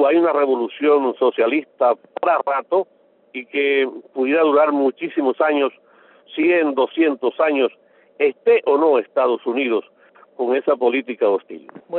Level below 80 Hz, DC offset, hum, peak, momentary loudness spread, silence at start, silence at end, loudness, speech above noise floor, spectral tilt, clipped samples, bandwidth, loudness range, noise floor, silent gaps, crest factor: -72 dBFS; under 0.1%; none; -4 dBFS; 9 LU; 0 s; 0 s; -19 LUFS; 31 dB; -1.5 dB/octave; under 0.1%; 4.2 kHz; 2 LU; -49 dBFS; none; 14 dB